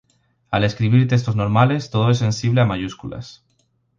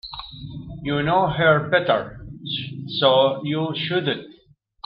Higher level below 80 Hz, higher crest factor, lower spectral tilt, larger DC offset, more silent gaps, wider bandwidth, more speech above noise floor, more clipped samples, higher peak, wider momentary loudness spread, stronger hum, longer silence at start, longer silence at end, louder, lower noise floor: about the same, -46 dBFS vs -50 dBFS; about the same, 18 dB vs 18 dB; second, -7 dB/octave vs -9 dB/octave; neither; neither; first, 7.4 kHz vs 5.4 kHz; first, 47 dB vs 36 dB; neither; about the same, -2 dBFS vs -4 dBFS; second, 16 LU vs 19 LU; neither; first, 0.5 s vs 0.05 s; about the same, 0.65 s vs 0.55 s; about the same, -19 LUFS vs -21 LUFS; first, -65 dBFS vs -56 dBFS